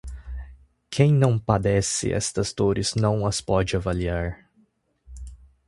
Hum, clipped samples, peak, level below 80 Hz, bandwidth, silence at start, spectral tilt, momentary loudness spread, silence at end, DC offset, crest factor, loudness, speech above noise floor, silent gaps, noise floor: none; under 0.1%; -4 dBFS; -40 dBFS; 11.5 kHz; 0.05 s; -5.5 dB/octave; 21 LU; 0.3 s; under 0.1%; 22 dB; -23 LUFS; 41 dB; none; -64 dBFS